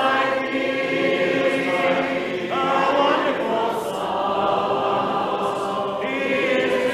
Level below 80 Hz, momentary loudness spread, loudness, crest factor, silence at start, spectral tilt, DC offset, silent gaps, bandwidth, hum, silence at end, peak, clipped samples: -58 dBFS; 5 LU; -21 LUFS; 14 dB; 0 s; -5 dB/octave; under 0.1%; none; 14.5 kHz; none; 0 s; -6 dBFS; under 0.1%